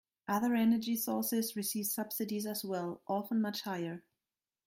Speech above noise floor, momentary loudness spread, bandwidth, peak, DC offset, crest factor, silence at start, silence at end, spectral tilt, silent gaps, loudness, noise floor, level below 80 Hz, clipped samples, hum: over 56 dB; 9 LU; 16.5 kHz; -20 dBFS; under 0.1%; 14 dB; 0.3 s; 0.65 s; -4.5 dB/octave; none; -35 LUFS; under -90 dBFS; -78 dBFS; under 0.1%; none